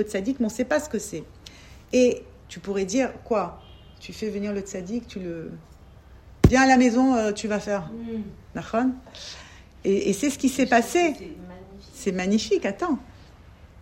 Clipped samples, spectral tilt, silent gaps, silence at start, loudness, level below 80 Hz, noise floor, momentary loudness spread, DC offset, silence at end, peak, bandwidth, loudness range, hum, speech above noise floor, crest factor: under 0.1%; -5 dB/octave; none; 0 s; -24 LUFS; -44 dBFS; -48 dBFS; 21 LU; under 0.1%; 0 s; 0 dBFS; 16 kHz; 7 LU; none; 24 dB; 24 dB